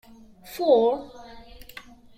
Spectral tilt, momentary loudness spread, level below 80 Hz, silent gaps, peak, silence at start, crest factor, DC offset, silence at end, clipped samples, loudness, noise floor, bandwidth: -5 dB/octave; 25 LU; -56 dBFS; none; -8 dBFS; 0.45 s; 20 dB; under 0.1%; 0.8 s; under 0.1%; -22 LUFS; -46 dBFS; 15.5 kHz